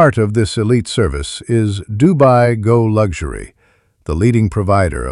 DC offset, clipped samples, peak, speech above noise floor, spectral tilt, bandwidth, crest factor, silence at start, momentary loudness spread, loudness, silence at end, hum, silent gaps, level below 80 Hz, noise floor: under 0.1%; under 0.1%; 0 dBFS; 42 dB; -7 dB/octave; 11 kHz; 12 dB; 0 s; 13 LU; -14 LUFS; 0 s; none; none; -30 dBFS; -56 dBFS